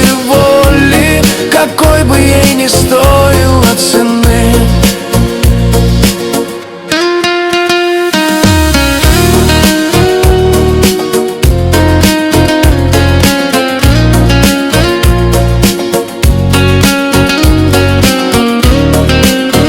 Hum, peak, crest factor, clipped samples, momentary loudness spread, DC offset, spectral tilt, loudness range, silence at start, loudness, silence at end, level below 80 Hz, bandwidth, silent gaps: none; 0 dBFS; 6 dB; 2%; 4 LU; under 0.1%; -5 dB/octave; 3 LU; 0 s; -8 LUFS; 0 s; -16 dBFS; 20 kHz; none